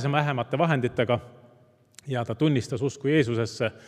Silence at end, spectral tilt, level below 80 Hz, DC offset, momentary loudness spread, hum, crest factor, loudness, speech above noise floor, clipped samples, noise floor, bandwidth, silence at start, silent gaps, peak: 0.1 s; -6.5 dB/octave; -64 dBFS; under 0.1%; 7 LU; none; 20 dB; -26 LUFS; 33 dB; under 0.1%; -58 dBFS; 11.5 kHz; 0 s; none; -6 dBFS